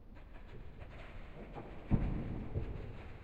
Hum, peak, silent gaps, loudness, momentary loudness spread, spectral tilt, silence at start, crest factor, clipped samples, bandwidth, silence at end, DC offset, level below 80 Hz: none; -20 dBFS; none; -43 LUFS; 18 LU; -9.5 dB/octave; 0 s; 20 dB; under 0.1%; 5 kHz; 0 s; under 0.1%; -44 dBFS